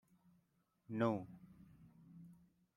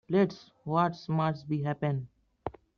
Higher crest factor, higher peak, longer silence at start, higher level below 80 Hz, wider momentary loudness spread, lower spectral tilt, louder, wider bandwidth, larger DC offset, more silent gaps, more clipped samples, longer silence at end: about the same, 24 dB vs 20 dB; second, -22 dBFS vs -12 dBFS; first, 0.9 s vs 0.1 s; second, -80 dBFS vs -64 dBFS; first, 25 LU vs 15 LU; first, -8.5 dB/octave vs -7 dB/octave; second, -41 LUFS vs -31 LUFS; first, 11 kHz vs 6.6 kHz; neither; neither; neither; first, 0.4 s vs 0.25 s